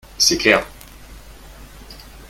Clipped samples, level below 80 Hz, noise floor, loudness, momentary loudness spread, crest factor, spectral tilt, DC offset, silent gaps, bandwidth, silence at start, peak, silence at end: under 0.1%; -42 dBFS; -40 dBFS; -15 LUFS; 26 LU; 22 dB; -1.5 dB/octave; under 0.1%; none; 17 kHz; 0.2 s; 0 dBFS; 0.05 s